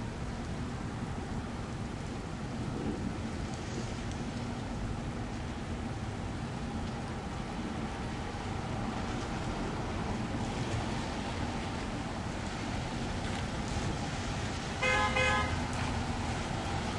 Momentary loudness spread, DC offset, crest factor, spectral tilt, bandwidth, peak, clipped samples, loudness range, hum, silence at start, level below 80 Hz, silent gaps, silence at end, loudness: 6 LU; under 0.1%; 18 dB; -5 dB/octave; 11.5 kHz; -16 dBFS; under 0.1%; 6 LU; none; 0 s; -44 dBFS; none; 0 s; -36 LUFS